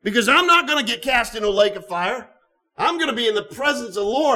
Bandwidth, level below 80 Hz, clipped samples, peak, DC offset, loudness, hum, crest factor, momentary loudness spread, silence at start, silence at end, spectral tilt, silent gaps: 17.5 kHz; -50 dBFS; under 0.1%; -4 dBFS; under 0.1%; -19 LUFS; none; 16 dB; 9 LU; 0.05 s; 0 s; -2.5 dB/octave; none